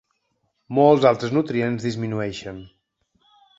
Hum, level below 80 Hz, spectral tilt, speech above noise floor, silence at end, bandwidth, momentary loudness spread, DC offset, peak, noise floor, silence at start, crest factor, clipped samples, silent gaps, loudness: none; -58 dBFS; -7 dB/octave; 52 dB; 0.9 s; 7.8 kHz; 18 LU; under 0.1%; -2 dBFS; -72 dBFS; 0.7 s; 20 dB; under 0.1%; none; -20 LUFS